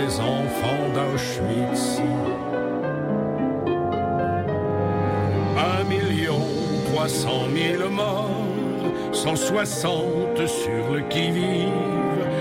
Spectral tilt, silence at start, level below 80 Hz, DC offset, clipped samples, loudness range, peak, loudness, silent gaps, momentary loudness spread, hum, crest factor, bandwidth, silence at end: -5.5 dB/octave; 0 s; -50 dBFS; under 0.1%; under 0.1%; 1 LU; -10 dBFS; -23 LUFS; none; 3 LU; none; 12 dB; 16 kHz; 0 s